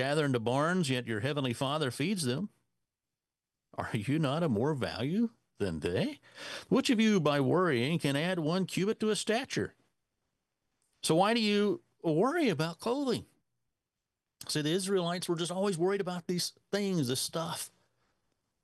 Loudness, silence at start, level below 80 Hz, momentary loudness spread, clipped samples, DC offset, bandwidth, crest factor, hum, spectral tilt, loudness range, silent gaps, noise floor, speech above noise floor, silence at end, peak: -31 LUFS; 0 s; -72 dBFS; 9 LU; under 0.1%; under 0.1%; 12.5 kHz; 18 dB; none; -5 dB/octave; 4 LU; none; under -90 dBFS; over 59 dB; 0.95 s; -14 dBFS